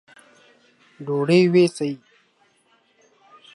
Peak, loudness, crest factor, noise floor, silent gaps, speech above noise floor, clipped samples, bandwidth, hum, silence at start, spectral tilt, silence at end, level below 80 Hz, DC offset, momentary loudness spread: -6 dBFS; -19 LUFS; 18 dB; -62 dBFS; none; 44 dB; under 0.1%; 11.5 kHz; none; 1 s; -6.5 dB/octave; 1.6 s; -74 dBFS; under 0.1%; 20 LU